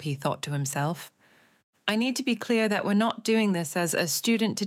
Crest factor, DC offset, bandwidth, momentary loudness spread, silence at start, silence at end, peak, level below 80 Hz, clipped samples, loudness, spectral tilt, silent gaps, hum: 20 dB; under 0.1%; 16.5 kHz; 6 LU; 0 s; 0 s; -8 dBFS; -78 dBFS; under 0.1%; -27 LUFS; -4.5 dB/octave; 1.63-1.73 s; none